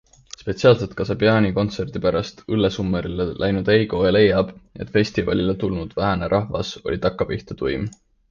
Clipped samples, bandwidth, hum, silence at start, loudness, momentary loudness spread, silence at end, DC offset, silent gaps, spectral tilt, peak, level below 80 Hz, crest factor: under 0.1%; 7.4 kHz; none; 0.4 s; -21 LUFS; 10 LU; 0.35 s; under 0.1%; none; -7 dB/octave; -2 dBFS; -40 dBFS; 18 dB